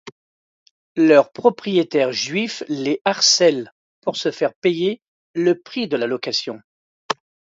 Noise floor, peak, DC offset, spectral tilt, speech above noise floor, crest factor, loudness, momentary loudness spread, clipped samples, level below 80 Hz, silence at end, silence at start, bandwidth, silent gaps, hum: under -90 dBFS; 0 dBFS; under 0.1%; -3.5 dB/octave; over 71 dB; 20 dB; -19 LUFS; 15 LU; under 0.1%; -72 dBFS; 0.4 s; 0.05 s; 7.8 kHz; 0.12-0.95 s, 3.01-3.05 s, 3.72-4.02 s, 4.56-4.62 s, 5.08-5.34 s, 6.64-7.09 s; none